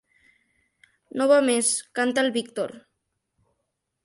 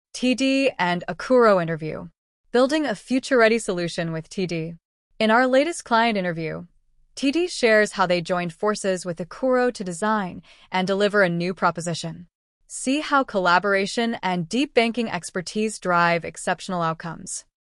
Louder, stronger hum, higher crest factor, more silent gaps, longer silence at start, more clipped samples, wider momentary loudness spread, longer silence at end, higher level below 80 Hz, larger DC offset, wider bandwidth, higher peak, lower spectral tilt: about the same, -23 LUFS vs -22 LUFS; neither; about the same, 20 dB vs 18 dB; second, none vs 2.18-2.44 s, 4.85-5.11 s, 12.35-12.61 s; first, 1.15 s vs 0.15 s; neither; about the same, 13 LU vs 13 LU; first, 1.25 s vs 0.35 s; second, -76 dBFS vs -58 dBFS; neither; about the same, 11.5 kHz vs 12 kHz; about the same, -6 dBFS vs -6 dBFS; second, -2 dB/octave vs -4.5 dB/octave